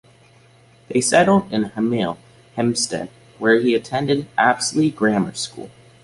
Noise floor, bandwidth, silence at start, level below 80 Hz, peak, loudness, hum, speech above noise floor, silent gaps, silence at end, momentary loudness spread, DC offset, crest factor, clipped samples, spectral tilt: -51 dBFS; 11.5 kHz; 0.9 s; -56 dBFS; -2 dBFS; -19 LUFS; none; 32 dB; none; 0.35 s; 13 LU; under 0.1%; 18 dB; under 0.1%; -4.5 dB/octave